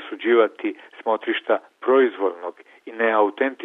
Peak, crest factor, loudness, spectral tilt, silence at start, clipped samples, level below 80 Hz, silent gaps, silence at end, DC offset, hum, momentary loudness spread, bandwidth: -4 dBFS; 18 dB; -21 LUFS; -6 dB/octave; 0 s; under 0.1%; -76 dBFS; none; 0 s; under 0.1%; none; 12 LU; 3.9 kHz